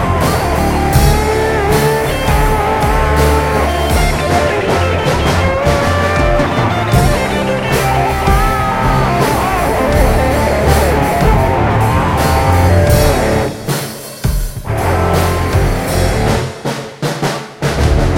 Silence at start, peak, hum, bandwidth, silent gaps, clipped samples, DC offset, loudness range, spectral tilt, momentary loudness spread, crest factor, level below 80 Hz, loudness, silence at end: 0 s; 0 dBFS; none; 17 kHz; none; under 0.1%; under 0.1%; 4 LU; -5.5 dB/octave; 7 LU; 12 dB; -18 dBFS; -13 LUFS; 0 s